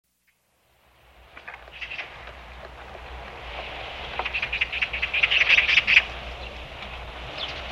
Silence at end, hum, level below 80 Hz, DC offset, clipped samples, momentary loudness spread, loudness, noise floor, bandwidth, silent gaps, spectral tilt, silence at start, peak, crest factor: 0 s; none; -44 dBFS; under 0.1%; under 0.1%; 25 LU; -22 LUFS; -68 dBFS; 14 kHz; none; -2 dB/octave; 1.2 s; -4 dBFS; 24 dB